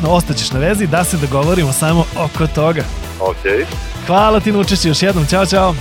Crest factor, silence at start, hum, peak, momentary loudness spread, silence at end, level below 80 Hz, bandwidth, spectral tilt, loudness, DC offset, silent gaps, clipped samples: 14 dB; 0 s; none; 0 dBFS; 7 LU; 0 s; -26 dBFS; 17 kHz; -5 dB/octave; -14 LUFS; under 0.1%; none; under 0.1%